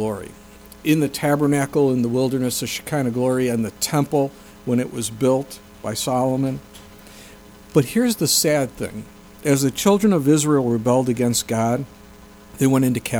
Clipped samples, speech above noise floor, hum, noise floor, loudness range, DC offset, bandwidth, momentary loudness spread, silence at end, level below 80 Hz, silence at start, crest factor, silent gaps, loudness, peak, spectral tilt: under 0.1%; 25 dB; none; -44 dBFS; 4 LU; under 0.1%; over 20 kHz; 11 LU; 0 s; -50 dBFS; 0 s; 18 dB; none; -20 LUFS; -4 dBFS; -5 dB/octave